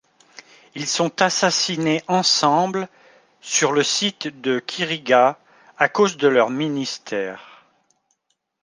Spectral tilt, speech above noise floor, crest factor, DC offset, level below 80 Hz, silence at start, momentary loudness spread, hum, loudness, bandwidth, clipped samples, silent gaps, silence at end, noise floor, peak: -3 dB/octave; 53 dB; 20 dB; under 0.1%; -72 dBFS; 0.75 s; 12 LU; none; -20 LUFS; 10.5 kHz; under 0.1%; none; 1.2 s; -73 dBFS; -2 dBFS